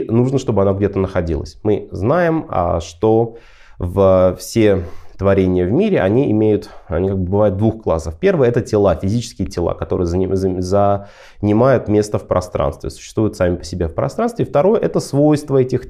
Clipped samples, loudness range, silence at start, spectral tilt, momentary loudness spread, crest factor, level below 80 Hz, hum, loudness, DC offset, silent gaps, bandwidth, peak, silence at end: under 0.1%; 2 LU; 0 s; -7.5 dB/octave; 7 LU; 14 dB; -36 dBFS; none; -17 LUFS; under 0.1%; none; 14 kHz; -2 dBFS; 0 s